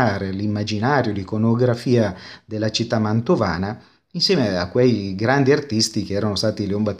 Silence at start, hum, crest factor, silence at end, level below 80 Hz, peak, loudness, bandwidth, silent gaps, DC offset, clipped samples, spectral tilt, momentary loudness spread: 0 s; none; 18 dB; 0 s; -52 dBFS; -2 dBFS; -20 LUFS; 13 kHz; none; under 0.1%; under 0.1%; -5.5 dB/octave; 7 LU